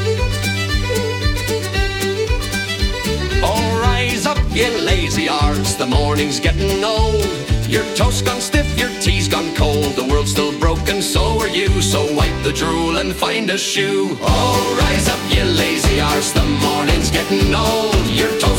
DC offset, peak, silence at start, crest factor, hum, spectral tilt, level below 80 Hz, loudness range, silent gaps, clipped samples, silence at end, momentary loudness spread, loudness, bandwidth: under 0.1%; -2 dBFS; 0 s; 16 dB; none; -4.5 dB/octave; -22 dBFS; 2 LU; none; under 0.1%; 0 s; 4 LU; -17 LUFS; 18 kHz